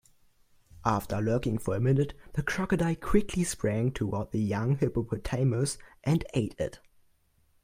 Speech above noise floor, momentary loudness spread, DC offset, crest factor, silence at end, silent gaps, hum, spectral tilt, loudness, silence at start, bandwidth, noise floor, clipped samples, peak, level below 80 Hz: 39 dB; 6 LU; under 0.1%; 20 dB; 0.85 s; none; none; -6.5 dB/octave; -30 LUFS; 0.75 s; 16 kHz; -67 dBFS; under 0.1%; -10 dBFS; -46 dBFS